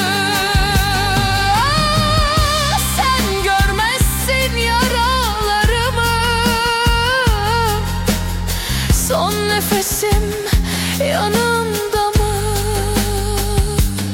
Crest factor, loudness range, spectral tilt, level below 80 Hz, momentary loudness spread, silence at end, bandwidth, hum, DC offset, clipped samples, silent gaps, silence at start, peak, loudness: 12 dB; 2 LU; -3.5 dB/octave; -22 dBFS; 4 LU; 0 s; 17 kHz; none; under 0.1%; under 0.1%; none; 0 s; -4 dBFS; -16 LUFS